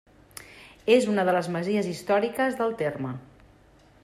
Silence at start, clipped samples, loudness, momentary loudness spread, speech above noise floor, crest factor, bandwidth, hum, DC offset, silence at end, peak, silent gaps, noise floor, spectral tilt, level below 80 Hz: 0.35 s; under 0.1%; -25 LUFS; 22 LU; 32 dB; 18 dB; 15.5 kHz; none; under 0.1%; 0.8 s; -8 dBFS; none; -56 dBFS; -5.5 dB/octave; -62 dBFS